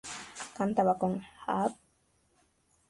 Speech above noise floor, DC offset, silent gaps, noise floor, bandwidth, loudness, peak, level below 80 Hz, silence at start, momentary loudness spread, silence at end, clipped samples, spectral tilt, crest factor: 41 dB; under 0.1%; none; -71 dBFS; 11.5 kHz; -32 LUFS; -14 dBFS; -68 dBFS; 0.05 s; 14 LU; 1.15 s; under 0.1%; -5.5 dB/octave; 20 dB